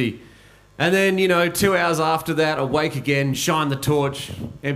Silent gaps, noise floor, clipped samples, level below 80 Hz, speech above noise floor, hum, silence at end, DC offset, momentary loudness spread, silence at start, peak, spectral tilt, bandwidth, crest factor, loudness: none; -49 dBFS; under 0.1%; -50 dBFS; 29 dB; none; 0 s; under 0.1%; 9 LU; 0 s; -4 dBFS; -4.5 dB/octave; 16 kHz; 18 dB; -20 LUFS